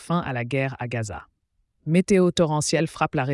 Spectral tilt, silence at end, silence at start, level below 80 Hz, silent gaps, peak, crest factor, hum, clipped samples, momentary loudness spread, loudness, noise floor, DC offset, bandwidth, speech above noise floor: -5.5 dB/octave; 0 s; 0 s; -54 dBFS; none; -8 dBFS; 16 dB; none; under 0.1%; 13 LU; -23 LUFS; -71 dBFS; under 0.1%; 12 kHz; 48 dB